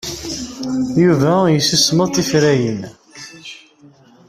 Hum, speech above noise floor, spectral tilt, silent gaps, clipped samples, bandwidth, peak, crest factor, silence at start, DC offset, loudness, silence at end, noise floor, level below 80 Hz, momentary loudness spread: none; 32 dB; -4.5 dB/octave; none; under 0.1%; 15.5 kHz; -2 dBFS; 16 dB; 0.05 s; under 0.1%; -15 LUFS; 0.75 s; -47 dBFS; -48 dBFS; 21 LU